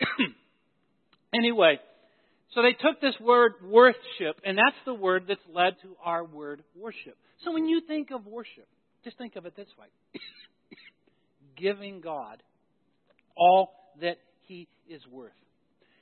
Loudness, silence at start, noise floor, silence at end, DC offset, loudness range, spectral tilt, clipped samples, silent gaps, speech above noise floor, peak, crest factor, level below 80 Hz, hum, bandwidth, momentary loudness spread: -25 LUFS; 0 s; -73 dBFS; 0.75 s; under 0.1%; 16 LU; -8.5 dB/octave; under 0.1%; none; 47 dB; -6 dBFS; 22 dB; -80 dBFS; none; 4.4 kHz; 23 LU